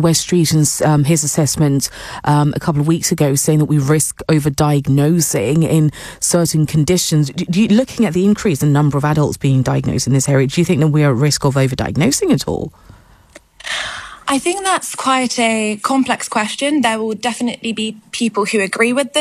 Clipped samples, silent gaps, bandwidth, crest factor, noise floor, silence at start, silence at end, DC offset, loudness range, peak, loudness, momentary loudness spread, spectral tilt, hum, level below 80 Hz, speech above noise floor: under 0.1%; none; 15 kHz; 14 dB; -45 dBFS; 0 s; 0 s; under 0.1%; 4 LU; -2 dBFS; -15 LUFS; 7 LU; -5 dB/octave; none; -44 dBFS; 30 dB